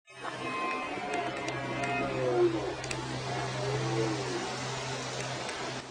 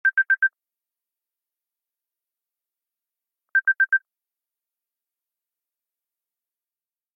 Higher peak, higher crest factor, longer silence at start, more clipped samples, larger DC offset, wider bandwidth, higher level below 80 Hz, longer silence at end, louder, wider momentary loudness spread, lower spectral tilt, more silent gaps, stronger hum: second, -16 dBFS vs -12 dBFS; about the same, 16 dB vs 16 dB; about the same, 0.1 s vs 0.05 s; neither; neither; first, 11 kHz vs 3.4 kHz; first, -58 dBFS vs under -90 dBFS; second, 0 s vs 3.2 s; second, -33 LUFS vs -21 LUFS; about the same, 6 LU vs 5 LU; first, -4.5 dB/octave vs 3 dB/octave; neither; neither